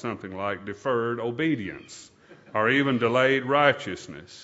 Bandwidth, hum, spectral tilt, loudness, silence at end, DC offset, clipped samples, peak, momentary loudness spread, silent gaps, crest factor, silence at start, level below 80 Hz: 8 kHz; none; -5.5 dB/octave; -25 LUFS; 0 s; under 0.1%; under 0.1%; -4 dBFS; 17 LU; none; 22 dB; 0 s; -66 dBFS